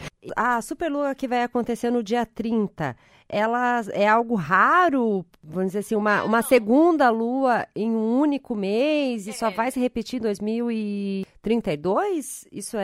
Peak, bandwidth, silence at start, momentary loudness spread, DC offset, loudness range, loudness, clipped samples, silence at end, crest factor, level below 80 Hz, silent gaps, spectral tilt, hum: -4 dBFS; 15.5 kHz; 0 s; 10 LU; under 0.1%; 5 LU; -23 LUFS; under 0.1%; 0 s; 18 dB; -58 dBFS; none; -5.5 dB/octave; none